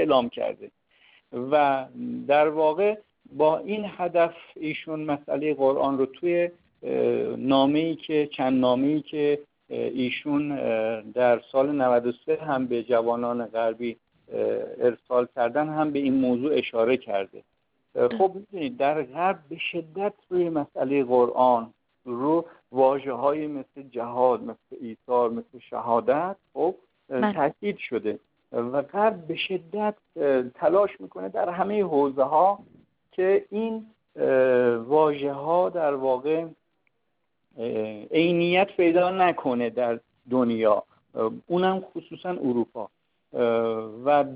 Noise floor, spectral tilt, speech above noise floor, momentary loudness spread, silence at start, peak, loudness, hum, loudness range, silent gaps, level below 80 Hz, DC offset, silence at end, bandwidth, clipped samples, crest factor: -78 dBFS; -10.5 dB/octave; 53 dB; 12 LU; 0 s; -6 dBFS; -25 LUFS; none; 3 LU; none; -68 dBFS; under 0.1%; 0 s; 5 kHz; under 0.1%; 18 dB